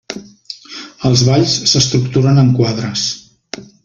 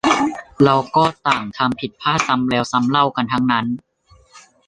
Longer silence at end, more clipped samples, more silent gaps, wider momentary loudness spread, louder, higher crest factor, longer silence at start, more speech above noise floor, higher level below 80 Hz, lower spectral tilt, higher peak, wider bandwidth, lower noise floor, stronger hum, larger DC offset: about the same, 0.2 s vs 0.3 s; neither; neither; first, 20 LU vs 6 LU; first, -13 LUFS vs -18 LUFS; about the same, 14 dB vs 18 dB; about the same, 0.1 s vs 0.05 s; second, 23 dB vs 31 dB; first, -46 dBFS vs -52 dBFS; about the same, -5 dB/octave vs -5 dB/octave; about the same, 0 dBFS vs 0 dBFS; second, 7.6 kHz vs 10.5 kHz; second, -35 dBFS vs -49 dBFS; neither; neither